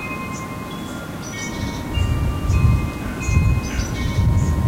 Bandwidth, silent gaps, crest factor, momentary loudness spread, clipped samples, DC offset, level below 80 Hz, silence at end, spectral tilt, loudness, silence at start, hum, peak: 16 kHz; none; 16 dB; 11 LU; under 0.1%; under 0.1%; -26 dBFS; 0 s; -6 dB/octave; -22 LUFS; 0 s; none; -4 dBFS